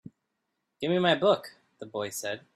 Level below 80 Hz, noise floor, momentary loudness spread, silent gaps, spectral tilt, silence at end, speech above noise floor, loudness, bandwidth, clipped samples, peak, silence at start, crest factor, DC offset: -74 dBFS; -81 dBFS; 19 LU; none; -4.5 dB/octave; 0.15 s; 53 dB; -28 LUFS; 15.5 kHz; under 0.1%; -10 dBFS; 0.8 s; 20 dB; under 0.1%